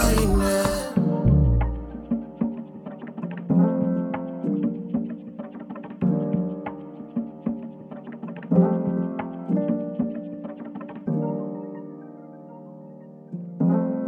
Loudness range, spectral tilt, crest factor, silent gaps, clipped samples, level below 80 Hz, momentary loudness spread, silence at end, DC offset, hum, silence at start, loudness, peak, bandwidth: 6 LU; -7 dB/octave; 20 dB; none; under 0.1%; -34 dBFS; 18 LU; 0 s; under 0.1%; none; 0 s; -25 LUFS; -6 dBFS; 18.5 kHz